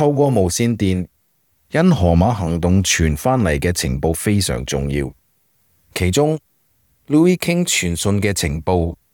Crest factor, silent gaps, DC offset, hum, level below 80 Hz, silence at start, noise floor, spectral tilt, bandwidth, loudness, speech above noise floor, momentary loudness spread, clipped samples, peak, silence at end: 14 dB; none; under 0.1%; none; -36 dBFS; 0 s; -63 dBFS; -5 dB/octave; 19.5 kHz; -17 LUFS; 46 dB; 8 LU; under 0.1%; -4 dBFS; 0.2 s